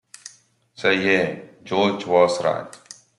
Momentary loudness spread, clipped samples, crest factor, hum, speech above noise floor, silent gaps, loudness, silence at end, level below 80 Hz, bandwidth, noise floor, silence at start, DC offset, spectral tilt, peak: 22 LU; under 0.1%; 20 dB; none; 35 dB; none; -21 LUFS; 0.4 s; -68 dBFS; 11.5 kHz; -55 dBFS; 0.25 s; under 0.1%; -4.5 dB/octave; -4 dBFS